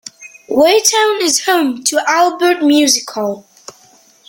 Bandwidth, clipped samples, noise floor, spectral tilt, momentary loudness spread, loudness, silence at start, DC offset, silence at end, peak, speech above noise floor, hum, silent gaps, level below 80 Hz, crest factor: 17 kHz; under 0.1%; -48 dBFS; -1 dB/octave; 11 LU; -12 LUFS; 0.2 s; under 0.1%; 0.9 s; 0 dBFS; 35 dB; none; none; -62 dBFS; 14 dB